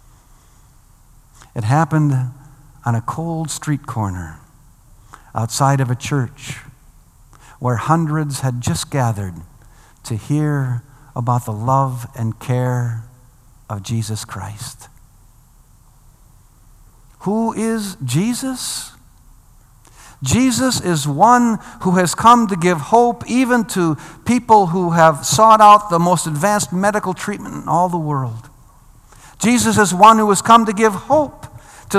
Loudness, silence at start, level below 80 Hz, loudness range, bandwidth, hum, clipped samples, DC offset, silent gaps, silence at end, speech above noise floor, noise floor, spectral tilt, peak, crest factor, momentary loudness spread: -16 LUFS; 1.55 s; -48 dBFS; 12 LU; 15 kHz; none; 0.2%; under 0.1%; none; 0 s; 32 dB; -48 dBFS; -5 dB/octave; 0 dBFS; 18 dB; 17 LU